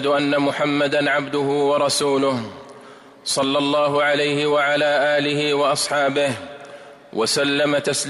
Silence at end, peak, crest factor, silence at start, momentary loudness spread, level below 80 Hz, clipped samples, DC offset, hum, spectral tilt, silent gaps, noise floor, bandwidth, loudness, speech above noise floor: 0 s; -8 dBFS; 12 dB; 0 s; 12 LU; -64 dBFS; under 0.1%; under 0.1%; none; -3.5 dB/octave; none; -43 dBFS; 15.5 kHz; -19 LUFS; 24 dB